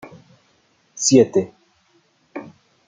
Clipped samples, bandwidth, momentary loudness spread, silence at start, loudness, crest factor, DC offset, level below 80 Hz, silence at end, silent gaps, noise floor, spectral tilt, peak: under 0.1%; 9.6 kHz; 23 LU; 0.05 s; -16 LUFS; 20 dB; under 0.1%; -66 dBFS; 0.45 s; none; -61 dBFS; -4.5 dB/octave; -2 dBFS